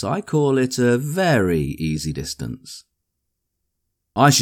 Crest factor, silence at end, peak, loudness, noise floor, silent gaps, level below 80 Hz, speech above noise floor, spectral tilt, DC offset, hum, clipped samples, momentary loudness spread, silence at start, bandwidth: 18 dB; 0 s; -2 dBFS; -20 LUFS; -77 dBFS; none; -44 dBFS; 57 dB; -5 dB/octave; under 0.1%; none; under 0.1%; 14 LU; 0 s; 19 kHz